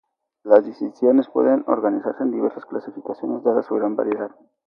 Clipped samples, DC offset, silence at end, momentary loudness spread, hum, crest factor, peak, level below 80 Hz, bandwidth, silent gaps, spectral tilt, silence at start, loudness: under 0.1%; under 0.1%; 0.4 s; 14 LU; none; 20 dB; 0 dBFS; -74 dBFS; 5.4 kHz; none; -9 dB/octave; 0.45 s; -21 LUFS